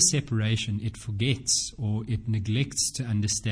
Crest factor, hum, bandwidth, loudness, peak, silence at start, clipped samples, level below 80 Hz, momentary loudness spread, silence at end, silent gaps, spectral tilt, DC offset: 18 dB; none; 10.5 kHz; -27 LUFS; -8 dBFS; 0 s; under 0.1%; -50 dBFS; 7 LU; 0 s; none; -3.5 dB/octave; under 0.1%